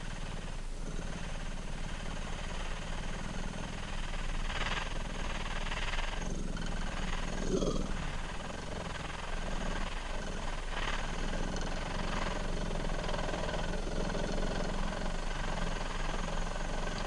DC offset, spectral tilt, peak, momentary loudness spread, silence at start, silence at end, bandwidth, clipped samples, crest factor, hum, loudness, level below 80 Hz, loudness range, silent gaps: under 0.1%; -4.5 dB/octave; -18 dBFS; 5 LU; 0 s; 0 s; 11 kHz; under 0.1%; 16 dB; none; -38 LUFS; -36 dBFS; 4 LU; none